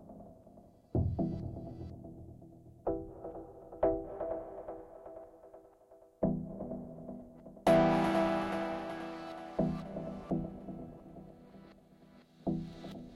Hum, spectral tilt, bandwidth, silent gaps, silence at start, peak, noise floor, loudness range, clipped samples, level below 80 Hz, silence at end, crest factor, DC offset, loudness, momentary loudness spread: none; -7.5 dB/octave; 13 kHz; none; 0 s; -16 dBFS; -61 dBFS; 9 LU; under 0.1%; -54 dBFS; 0 s; 22 dB; under 0.1%; -36 LUFS; 23 LU